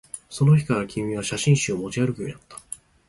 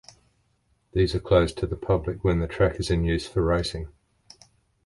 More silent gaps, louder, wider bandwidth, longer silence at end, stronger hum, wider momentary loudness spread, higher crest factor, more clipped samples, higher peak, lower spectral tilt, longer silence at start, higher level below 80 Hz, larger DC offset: neither; about the same, -23 LUFS vs -25 LUFS; about the same, 11.5 kHz vs 11.5 kHz; second, 0.35 s vs 0.95 s; neither; first, 18 LU vs 10 LU; about the same, 18 dB vs 20 dB; neither; about the same, -6 dBFS vs -6 dBFS; about the same, -5.5 dB/octave vs -6.5 dB/octave; second, 0.15 s vs 0.95 s; second, -54 dBFS vs -36 dBFS; neither